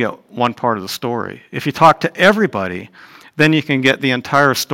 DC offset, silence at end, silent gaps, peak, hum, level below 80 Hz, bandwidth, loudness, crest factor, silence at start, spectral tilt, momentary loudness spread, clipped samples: under 0.1%; 0 s; none; 0 dBFS; none; -56 dBFS; 17 kHz; -15 LUFS; 16 dB; 0 s; -5 dB/octave; 12 LU; under 0.1%